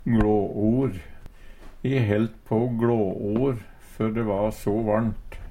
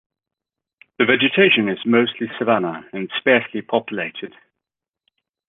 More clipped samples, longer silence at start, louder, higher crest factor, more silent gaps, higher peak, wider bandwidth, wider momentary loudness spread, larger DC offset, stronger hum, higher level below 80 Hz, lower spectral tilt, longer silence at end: neither; second, 0 s vs 1 s; second, -25 LUFS vs -18 LUFS; about the same, 16 dB vs 18 dB; neither; second, -8 dBFS vs -2 dBFS; first, 15.5 kHz vs 4 kHz; second, 7 LU vs 13 LU; neither; neither; first, -40 dBFS vs -66 dBFS; about the same, -9 dB/octave vs -8.5 dB/octave; second, 0 s vs 1.2 s